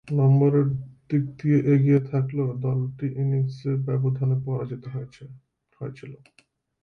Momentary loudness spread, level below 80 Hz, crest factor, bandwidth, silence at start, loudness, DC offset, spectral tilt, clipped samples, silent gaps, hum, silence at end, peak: 18 LU; -58 dBFS; 14 dB; 4.8 kHz; 0.05 s; -24 LUFS; under 0.1%; -11 dB/octave; under 0.1%; none; none; 0.7 s; -10 dBFS